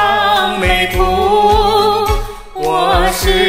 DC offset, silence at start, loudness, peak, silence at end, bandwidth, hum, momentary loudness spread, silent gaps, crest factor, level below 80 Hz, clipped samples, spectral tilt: 1%; 0 s; -13 LUFS; 0 dBFS; 0 s; 16 kHz; none; 7 LU; none; 12 dB; -22 dBFS; under 0.1%; -4 dB/octave